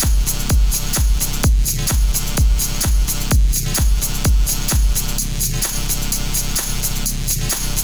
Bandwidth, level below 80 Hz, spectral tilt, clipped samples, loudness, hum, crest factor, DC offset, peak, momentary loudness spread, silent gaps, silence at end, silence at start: over 20 kHz; -18 dBFS; -3 dB/octave; under 0.1%; -18 LUFS; none; 10 dB; 3%; -6 dBFS; 3 LU; none; 0 s; 0 s